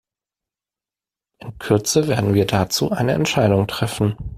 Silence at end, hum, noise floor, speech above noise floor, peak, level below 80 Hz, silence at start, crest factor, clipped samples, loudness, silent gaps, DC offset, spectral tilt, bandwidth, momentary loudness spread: 0 s; none; under -90 dBFS; over 72 dB; -2 dBFS; -44 dBFS; 1.4 s; 18 dB; under 0.1%; -19 LUFS; none; under 0.1%; -5 dB/octave; 16 kHz; 8 LU